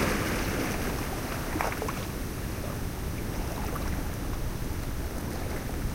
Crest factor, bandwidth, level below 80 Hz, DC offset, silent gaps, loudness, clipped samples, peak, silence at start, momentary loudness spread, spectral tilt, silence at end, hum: 22 dB; 16.5 kHz; -36 dBFS; under 0.1%; none; -33 LUFS; under 0.1%; -10 dBFS; 0 s; 5 LU; -5 dB/octave; 0 s; none